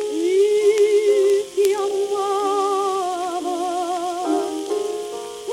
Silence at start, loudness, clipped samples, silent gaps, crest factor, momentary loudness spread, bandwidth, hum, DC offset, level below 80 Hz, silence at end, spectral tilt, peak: 0 s; -20 LUFS; under 0.1%; none; 16 dB; 8 LU; 14 kHz; none; under 0.1%; -66 dBFS; 0 s; -2.5 dB/octave; -4 dBFS